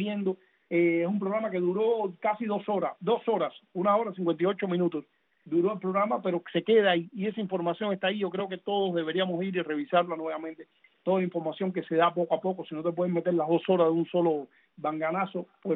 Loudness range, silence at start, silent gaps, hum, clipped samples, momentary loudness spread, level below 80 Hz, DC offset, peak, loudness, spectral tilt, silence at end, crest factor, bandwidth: 2 LU; 0 s; none; none; under 0.1%; 8 LU; -80 dBFS; under 0.1%; -10 dBFS; -28 LUFS; -10 dB/octave; 0 s; 18 dB; 4.1 kHz